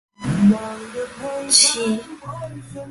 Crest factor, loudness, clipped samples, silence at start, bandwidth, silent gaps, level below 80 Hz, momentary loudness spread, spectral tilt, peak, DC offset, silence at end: 20 dB; -17 LUFS; under 0.1%; 0.2 s; 11.5 kHz; none; -52 dBFS; 20 LU; -3 dB/octave; 0 dBFS; under 0.1%; 0 s